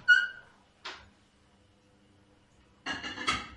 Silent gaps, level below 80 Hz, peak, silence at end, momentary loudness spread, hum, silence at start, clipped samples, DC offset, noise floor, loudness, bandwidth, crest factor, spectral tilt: none; -62 dBFS; -10 dBFS; 0 s; 24 LU; none; 0.05 s; under 0.1%; under 0.1%; -64 dBFS; -30 LUFS; 11 kHz; 22 dB; -1 dB/octave